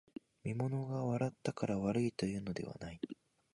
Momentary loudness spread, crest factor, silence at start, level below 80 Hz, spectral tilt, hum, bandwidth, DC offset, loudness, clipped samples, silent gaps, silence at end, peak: 12 LU; 18 dB; 0.45 s; -66 dBFS; -7 dB/octave; none; 11.5 kHz; under 0.1%; -39 LUFS; under 0.1%; none; 0.4 s; -22 dBFS